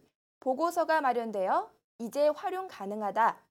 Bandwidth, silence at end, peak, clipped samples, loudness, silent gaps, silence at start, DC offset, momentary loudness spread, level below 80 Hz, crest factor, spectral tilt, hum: 18 kHz; 0.15 s; -14 dBFS; under 0.1%; -30 LUFS; 1.84-1.99 s; 0.45 s; under 0.1%; 10 LU; -84 dBFS; 16 dB; -4.5 dB/octave; none